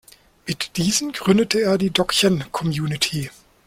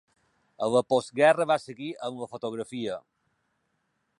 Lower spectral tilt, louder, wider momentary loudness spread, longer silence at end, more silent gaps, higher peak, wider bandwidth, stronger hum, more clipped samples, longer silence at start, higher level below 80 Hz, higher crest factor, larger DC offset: about the same, -4 dB/octave vs -5 dB/octave; first, -20 LUFS vs -27 LUFS; second, 11 LU vs 14 LU; second, 0.35 s vs 1.2 s; neither; first, -2 dBFS vs -8 dBFS; first, 16.5 kHz vs 11.5 kHz; neither; neither; second, 0.45 s vs 0.6 s; first, -50 dBFS vs -74 dBFS; about the same, 18 dB vs 20 dB; neither